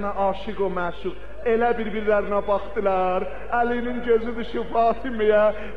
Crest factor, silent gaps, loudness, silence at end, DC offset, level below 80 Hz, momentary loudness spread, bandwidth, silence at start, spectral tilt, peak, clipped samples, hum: 14 dB; none; -23 LUFS; 0 s; 3%; -42 dBFS; 8 LU; 6 kHz; 0 s; -7.5 dB/octave; -8 dBFS; under 0.1%; none